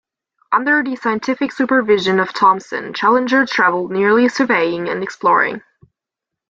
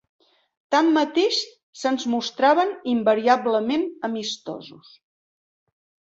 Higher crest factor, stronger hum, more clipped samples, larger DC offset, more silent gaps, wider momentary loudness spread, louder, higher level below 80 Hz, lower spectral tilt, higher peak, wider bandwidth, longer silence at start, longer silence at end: about the same, 16 dB vs 20 dB; neither; neither; neither; second, none vs 1.63-1.73 s; second, 7 LU vs 11 LU; first, -16 LUFS vs -22 LUFS; first, -62 dBFS vs -70 dBFS; first, -5 dB/octave vs -3.5 dB/octave; about the same, -2 dBFS vs -4 dBFS; about the same, 7.8 kHz vs 8 kHz; second, 0.5 s vs 0.7 s; second, 0.9 s vs 1.4 s